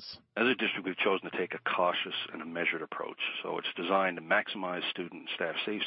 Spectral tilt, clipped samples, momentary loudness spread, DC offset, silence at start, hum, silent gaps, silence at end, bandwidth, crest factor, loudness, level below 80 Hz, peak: -7 dB/octave; under 0.1%; 8 LU; under 0.1%; 0 s; none; none; 0 s; 6 kHz; 20 dB; -32 LUFS; -80 dBFS; -14 dBFS